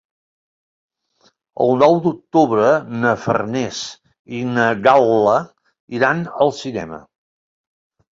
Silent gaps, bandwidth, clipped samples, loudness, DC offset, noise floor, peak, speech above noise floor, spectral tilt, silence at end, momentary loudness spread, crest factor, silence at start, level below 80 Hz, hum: 4.19-4.25 s, 5.80-5.88 s; 7.8 kHz; under 0.1%; -17 LUFS; under 0.1%; -60 dBFS; -2 dBFS; 43 dB; -6 dB/octave; 1.1 s; 17 LU; 18 dB; 1.6 s; -58 dBFS; none